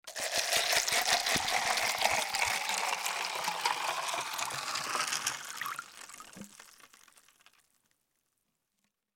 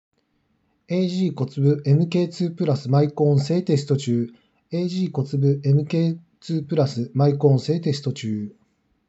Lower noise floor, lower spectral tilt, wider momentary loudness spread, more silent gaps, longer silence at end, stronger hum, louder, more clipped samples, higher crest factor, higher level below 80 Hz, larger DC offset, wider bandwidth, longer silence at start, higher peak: first, -81 dBFS vs -68 dBFS; second, 0.5 dB/octave vs -8 dB/octave; first, 18 LU vs 9 LU; neither; first, 2.3 s vs 0.55 s; neither; second, -31 LUFS vs -22 LUFS; neither; first, 24 dB vs 18 dB; first, -68 dBFS vs -74 dBFS; neither; first, 17 kHz vs 8 kHz; second, 0.05 s vs 0.9 s; second, -10 dBFS vs -4 dBFS